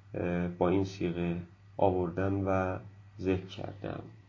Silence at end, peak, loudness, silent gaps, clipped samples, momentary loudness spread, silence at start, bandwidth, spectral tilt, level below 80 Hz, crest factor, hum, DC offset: 0.05 s; -12 dBFS; -33 LUFS; none; under 0.1%; 12 LU; 0.05 s; 7.2 kHz; -8 dB/octave; -50 dBFS; 20 dB; none; under 0.1%